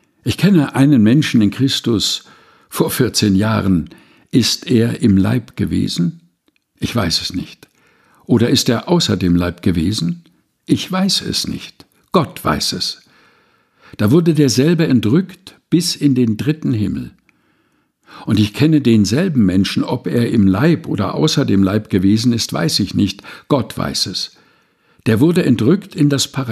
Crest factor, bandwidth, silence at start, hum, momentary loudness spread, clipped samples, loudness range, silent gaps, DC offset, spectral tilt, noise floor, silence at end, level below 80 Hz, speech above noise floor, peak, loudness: 14 dB; 14.5 kHz; 0.25 s; none; 9 LU; under 0.1%; 4 LU; none; under 0.1%; -5.5 dB/octave; -62 dBFS; 0 s; -44 dBFS; 47 dB; 0 dBFS; -15 LUFS